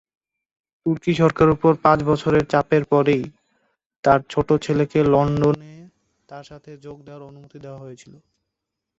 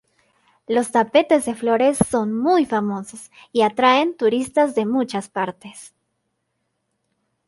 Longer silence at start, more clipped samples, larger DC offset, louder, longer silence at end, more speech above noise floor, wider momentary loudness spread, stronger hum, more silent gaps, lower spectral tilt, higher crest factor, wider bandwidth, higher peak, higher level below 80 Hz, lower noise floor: first, 0.85 s vs 0.7 s; neither; neither; about the same, -19 LUFS vs -19 LUFS; second, 1.05 s vs 1.6 s; first, 62 dB vs 55 dB; first, 23 LU vs 11 LU; neither; first, 3.86-3.90 s, 3.96-4.03 s vs none; first, -7.5 dB/octave vs -4.5 dB/octave; about the same, 20 dB vs 18 dB; second, 8 kHz vs 12 kHz; about the same, -2 dBFS vs -2 dBFS; first, -48 dBFS vs -56 dBFS; first, -82 dBFS vs -74 dBFS